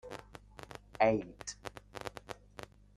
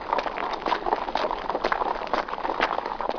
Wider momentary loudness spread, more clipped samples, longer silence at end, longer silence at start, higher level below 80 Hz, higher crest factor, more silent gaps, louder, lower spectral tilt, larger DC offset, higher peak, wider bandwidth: first, 22 LU vs 3 LU; neither; first, 0.3 s vs 0 s; about the same, 0.05 s vs 0 s; second, -62 dBFS vs -48 dBFS; about the same, 24 dB vs 22 dB; neither; second, -36 LUFS vs -27 LUFS; about the same, -4.5 dB/octave vs -4 dB/octave; neither; second, -14 dBFS vs -6 dBFS; first, 13.5 kHz vs 5.4 kHz